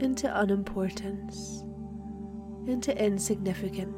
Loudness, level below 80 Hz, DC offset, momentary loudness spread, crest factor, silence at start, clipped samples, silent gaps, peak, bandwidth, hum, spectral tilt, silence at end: -32 LUFS; -50 dBFS; under 0.1%; 13 LU; 16 dB; 0 s; under 0.1%; none; -14 dBFS; 16.5 kHz; none; -5 dB/octave; 0 s